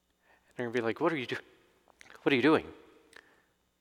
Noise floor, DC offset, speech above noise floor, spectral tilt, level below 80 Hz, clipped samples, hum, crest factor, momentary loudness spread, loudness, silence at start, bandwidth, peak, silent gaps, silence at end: -70 dBFS; under 0.1%; 40 dB; -6 dB/octave; -70 dBFS; under 0.1%; none; 22 dB; 16 LU; -31 LUFS; 0.6 s; 12.5 kHz; -12 dBFS; none; 1.05 s